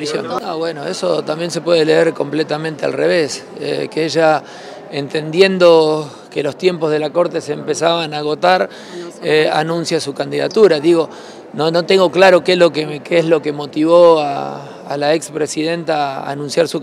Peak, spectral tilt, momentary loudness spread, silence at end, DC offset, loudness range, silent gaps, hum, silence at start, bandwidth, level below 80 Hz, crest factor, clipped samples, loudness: 0 dBFS; -5 dB/octave; 13 LU; 0 s; under 0.1%; 4 LU; none; none; 0 s; 13 kHz; -66 dBFS; 14 dB; under 0.1%; -15 LUFS